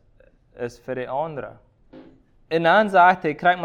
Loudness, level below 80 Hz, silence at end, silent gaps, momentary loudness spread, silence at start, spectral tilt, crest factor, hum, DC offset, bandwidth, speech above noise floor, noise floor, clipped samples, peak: -20 LUFS; -58 dBFS; 0 s; none; 18 LU; 0.6 s; -6 dB/octave; 18 dB; none; under 0.1%; 9.6 kHz; 36 dB; -56 dBFS; under 0.1%; -4 dBFS